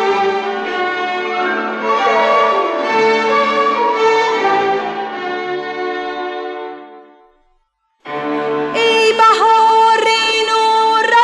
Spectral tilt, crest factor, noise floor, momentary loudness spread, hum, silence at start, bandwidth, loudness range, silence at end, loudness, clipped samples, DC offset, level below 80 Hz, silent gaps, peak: -2.5 dB/octave; 12 dB; -62 dBFS; 12 LU; none; 0 s; 11.5 kHz; 11 LU; 0 s; -14 LUFS; under 0.1%; under 0.1%; -62 dBFS; none; -2 dBFS